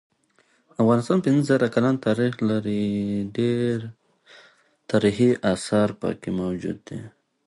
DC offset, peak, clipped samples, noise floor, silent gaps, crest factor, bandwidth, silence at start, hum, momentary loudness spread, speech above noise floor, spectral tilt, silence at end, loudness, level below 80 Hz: under 0.1%; -6 dBFS; under 0.1%; -64 dBFS; none; 18 dB; 11.5 kHz; 0.8 s; none; 11 LU; 41 dB; -7 dB/octave; 0.4 s; -23 LUFS; -56 dBFS